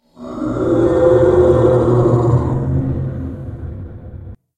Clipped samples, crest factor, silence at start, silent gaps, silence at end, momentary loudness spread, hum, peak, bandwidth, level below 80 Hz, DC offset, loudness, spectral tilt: under 0.1%; 14 dB; 0.2 s; none; 0.2 s; 20 LU; none; 0 dBFS; 8.8 kHz; -32 dBFS; under 0.1%; -14 LUFS; -10 dB/octave